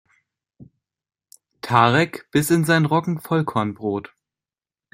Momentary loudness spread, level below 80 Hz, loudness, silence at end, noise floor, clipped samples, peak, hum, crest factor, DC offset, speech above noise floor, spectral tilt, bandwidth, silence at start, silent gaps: 11 LU; -60 dBFS; -20 LUFS; 0.9 s; under -90 dBFS; under 0.1%; -2 dBFS; none; 22 dB; under 0.1%; over 71 dB; -5.5 dB/octave; 16 kHz; 0.6 s; none